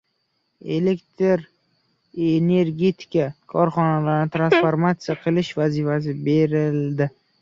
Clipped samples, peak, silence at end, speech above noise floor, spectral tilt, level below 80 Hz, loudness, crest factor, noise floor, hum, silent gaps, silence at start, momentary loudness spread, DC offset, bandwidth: under 0.1%; -4 dBFS; 0.3 s; 51 dB; -8 dB/octave; -60 dBFS; -21 LUFS; 16 dB; -71 dBFS; none; none; 0.65 s; 7 LU; under 0.1%; 7.4 kHz